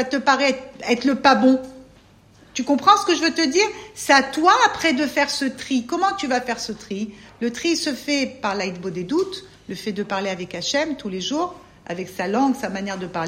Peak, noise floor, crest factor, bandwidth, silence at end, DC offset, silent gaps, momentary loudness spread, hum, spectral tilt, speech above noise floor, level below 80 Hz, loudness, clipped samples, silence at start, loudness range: 0 dBFS; -51 dBFS; 20 dB; 16 kHz; 0 s; under 0.1%; none; 14 LU; none; -3 dB/octave; 30 dB; -58 dBFS; -21 LUFS; under 0.1%; 0 s; 7 LU